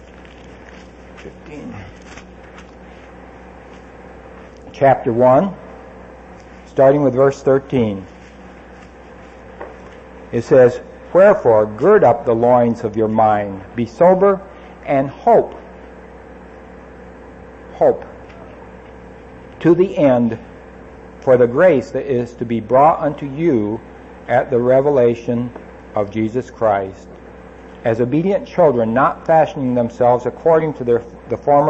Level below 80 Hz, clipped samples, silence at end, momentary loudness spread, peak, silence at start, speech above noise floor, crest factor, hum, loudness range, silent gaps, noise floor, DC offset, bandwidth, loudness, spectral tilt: -46 dBFS; under 0.1%; 0 s; 23 LU; 0 dBFS; 0.5 s; 24 dB; 16 dB; none; 11 LU; none; -39 dBFS; under 0.1%; 8 kHz; -15 LUFS; -8.5 dB/octave